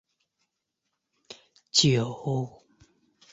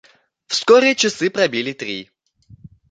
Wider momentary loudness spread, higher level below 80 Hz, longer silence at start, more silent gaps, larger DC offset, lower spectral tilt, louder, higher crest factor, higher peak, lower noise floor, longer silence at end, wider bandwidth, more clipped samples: second, 11 LU vs 15 LU; about the same, -66 dBFS vs -62 dBFS; first, 1.3 s vs 0.5 s; neither; neither; first, -4 dB/octave vs -2.5 dB/octave; second, -25 LUFS vs -17 LUFS; first, 24 dB vs 18 dB; second, -6 dBFS vs -2 dBFS; first, -82 dBFS vs -49 dBFS; about the same, 0.85 s vs 0.85 s; second, 8 kHz vs 9.4 kHz; neither